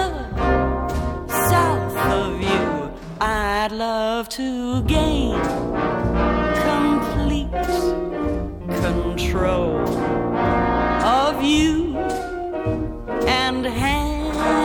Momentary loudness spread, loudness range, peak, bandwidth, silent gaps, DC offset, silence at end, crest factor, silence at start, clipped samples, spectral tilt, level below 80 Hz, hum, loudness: 7 LU; 2 LU; -4 dBFS; 19 kHz; none; under 0.1%; 0 s; 16 dB; 0 s; under 0.1%; -5.5 dB/octave; -30 dBFS; none; -21 LUFS